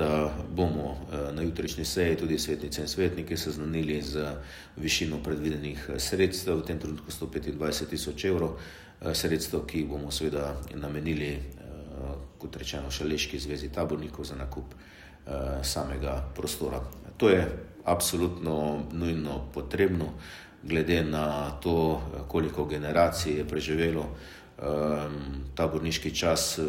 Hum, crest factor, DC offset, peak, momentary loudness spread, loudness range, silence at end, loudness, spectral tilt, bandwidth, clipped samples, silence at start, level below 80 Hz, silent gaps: none; 22 dB; under 0.1%; -8 dBFS; 12 LU; 6 LU; 0 s; -30 LUFS; -4.5 dB/octave; 16 kHz; under 0.1%; 0 s; -44 dBFS; none